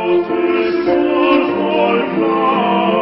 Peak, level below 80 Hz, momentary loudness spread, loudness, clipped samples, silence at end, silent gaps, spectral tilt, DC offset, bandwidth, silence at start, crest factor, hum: -2 dBFS; -52 dBFS; 3 LU; -14 LUFS; under 0.1%; 0 s; none; -11 dB/octave; under 0.1%; 5.8 kHz; 0 s; 12 dB; none